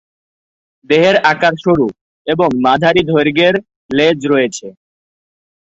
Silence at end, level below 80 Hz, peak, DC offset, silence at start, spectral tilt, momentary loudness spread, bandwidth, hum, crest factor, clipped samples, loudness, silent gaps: 1.1 s; -50 dBFS; 0 dBFS; under 0.1%; 0.9 s; -5.5 dB/octave; 9 LU; 8 kHz; none; 14 dB; under 0.1%; -13 LUFS; 2.01-2.25 s, 3.76-3.89 s